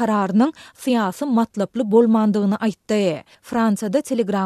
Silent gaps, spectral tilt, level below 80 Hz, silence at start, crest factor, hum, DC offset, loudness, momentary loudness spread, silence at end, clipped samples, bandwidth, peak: none; -6.5 dB/octave; -62 dBFS; 0 s; 16 dB; none; under 0.1%; -20 LUFS; 7 LU; 0 s; under 0.1%; 13.5 kHz; -4 dBFS